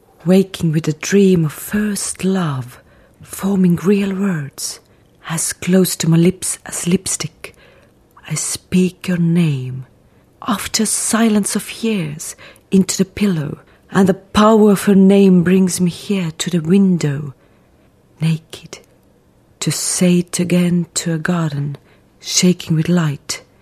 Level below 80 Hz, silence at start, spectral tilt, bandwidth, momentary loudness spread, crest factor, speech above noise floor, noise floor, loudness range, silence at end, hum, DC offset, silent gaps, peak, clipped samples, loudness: -50 dBFS; 0.25 s; -5.5 dB/octave; 14 kHz; 15 LU; 16 dB; 37 dB; -52 dBFS; 7 LU; 0.2 s; none; under 0.1%; none; 0 dBFS; under 0.1%; -16 LUFS